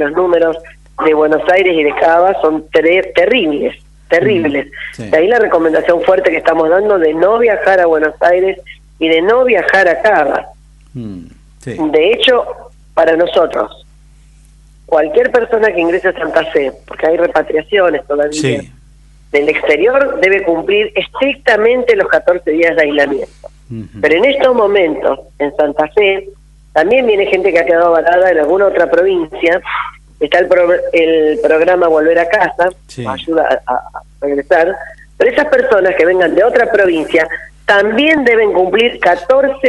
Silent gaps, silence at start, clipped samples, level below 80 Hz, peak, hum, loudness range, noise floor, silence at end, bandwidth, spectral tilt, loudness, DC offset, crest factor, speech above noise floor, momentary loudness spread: none; 0 s; under 0.1%; -42 dBFS; 0 dBFS; none; 3 LU; -42 dBFS; 0 s; 11 kHz; -5 dB/octave; -11 LUFS; under 0.1%; 12 dB; 31 dB; 10 LU